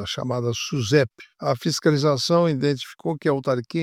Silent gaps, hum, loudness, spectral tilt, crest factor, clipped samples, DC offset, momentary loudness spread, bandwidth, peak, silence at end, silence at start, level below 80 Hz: none; none; -23 LUFS; -5.5 dB/octave; 18 dB; under 0.1%; under 0.1%; 8 LU; 15.5 kHz; -4 dBFS; 0 s; 0 s; -60 dBFS